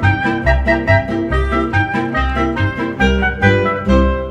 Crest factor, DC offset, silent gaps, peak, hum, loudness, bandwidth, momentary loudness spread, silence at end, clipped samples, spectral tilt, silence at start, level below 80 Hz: 14 dB; under 0.1%; none; 0 dBFS; none; -15 LUFS; 8.2 kHz; 4 LU; 0 s; under 0.1%; -7.5 dB/octave; 0 s; -22 dBFS